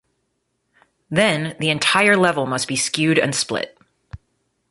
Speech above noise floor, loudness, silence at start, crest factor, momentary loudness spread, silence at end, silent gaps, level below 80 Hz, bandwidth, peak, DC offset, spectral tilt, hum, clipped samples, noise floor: 53 dB; -18 LUFS; 1.1 s; 20 dB; 9 LU; 0.55 s; none; -56 dBFS; 12 kHz; -2 dBFS; under 0.1%; -3.5 dB/octave; none; under 0.1%; -72 dBFS